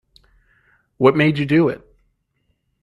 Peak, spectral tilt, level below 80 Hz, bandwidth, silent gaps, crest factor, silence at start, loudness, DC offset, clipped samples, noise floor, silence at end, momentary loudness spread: 0 dBFS; -8.5 dB/octave; -56 dBFS; 11 kHz; none; 20 dB; 1 s; -17 LUFS; under 0.1%; under 0.1%; -68 dBFS; 1.05 s; 7 LU